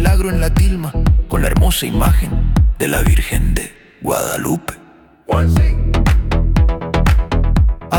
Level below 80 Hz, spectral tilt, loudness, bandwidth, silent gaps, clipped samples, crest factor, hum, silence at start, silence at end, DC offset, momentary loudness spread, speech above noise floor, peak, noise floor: -16 dBFS; -5.5 dB/octave; -16 LUFS; 19 kHz; none; under 0.1%; 12 dB; none; 0 s; 0 s; under 0.1%; 6 LU; 31 dB; -2 dBFS; -44 dBFS